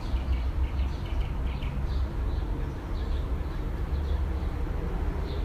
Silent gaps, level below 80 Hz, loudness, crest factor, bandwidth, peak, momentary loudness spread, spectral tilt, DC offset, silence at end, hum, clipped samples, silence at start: none; -30 dBFS; -32 LUFS; 10 dB; 7.2 kHz; -18 dBFS; 3 LU; -7.5 dB/octave; under 0.1%; 0 s; none; under 0.1%; 0 s